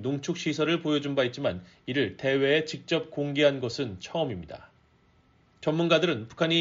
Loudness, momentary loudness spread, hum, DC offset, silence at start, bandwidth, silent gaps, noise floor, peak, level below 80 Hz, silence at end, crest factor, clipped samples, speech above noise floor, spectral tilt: -27 LUFS; 9 LU; none; under 0.1%; 0 s; 7.6 kHz; none; -63 dBFS; -8 dBFS; -64 dBFS; 0 s; 20 dB; under 0.1%; 36 dB; -4 dB/octave